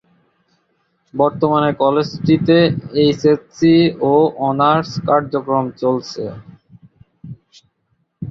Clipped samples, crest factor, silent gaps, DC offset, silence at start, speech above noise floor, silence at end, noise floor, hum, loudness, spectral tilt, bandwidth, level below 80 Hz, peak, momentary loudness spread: under 0.1%; 16 dB; none; under 0.1%; 1.15 s; 51 dB; 0 s; -66 dBFS; none; -16 LUFS; -7 dB/octave; 7.4 kHz; -52 dBFS; -2 dBFS; 15 LU